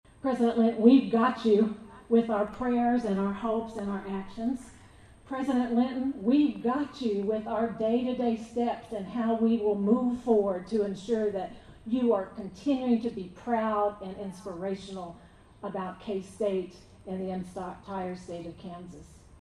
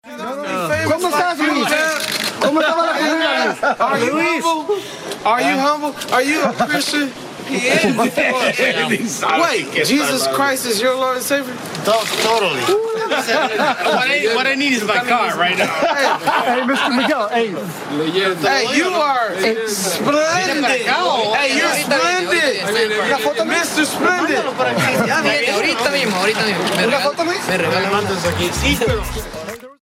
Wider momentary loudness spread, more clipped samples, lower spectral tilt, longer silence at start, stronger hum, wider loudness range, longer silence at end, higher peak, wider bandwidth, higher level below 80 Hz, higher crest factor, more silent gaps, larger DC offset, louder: first, 14 LU vs 4 LU; neither; first, -7.5 dB/octave vs -3 dB/octave; first, 0.25 s vs 0.05 s; neither; first, 10 LU vs 2 LU; first, 0.25 s vs 0.1 s; second, -8 dBFS vs -2 dBFS; second, 10.5 kHz vs 16 kHz; second, -58 dBFS vs -42 dBFS; first, 22 dB vs 16 dB; neither; neither; second, -29 LUFS vs -16 LUFS